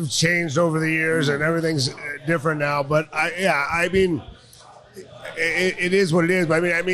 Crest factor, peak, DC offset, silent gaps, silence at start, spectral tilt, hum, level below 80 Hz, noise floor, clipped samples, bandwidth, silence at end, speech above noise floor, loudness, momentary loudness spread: 14 dB; -6 dBFS; under 0.1%; none; 0 s; -4.5 dB/octave; none; -50 dBFS; -47 dBFS; under 0.1%; 14 kHz; 0 s; 26 dB; -21 LUFS; 5 LU